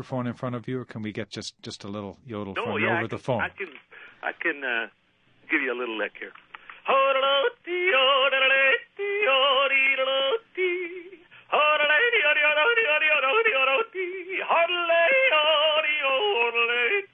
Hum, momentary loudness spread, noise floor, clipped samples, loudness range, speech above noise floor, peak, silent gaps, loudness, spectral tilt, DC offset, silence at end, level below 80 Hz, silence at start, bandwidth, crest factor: none; 16 LU; -55 dBFS; under 0.1%; 9 LU; 30 dB; -10 dBFS; none; -22 LUFS; -4.5 dB/octave; under 0.1%; 0.1 s; -68 dBFS; 0 s; 9.4 kHz; 14 dB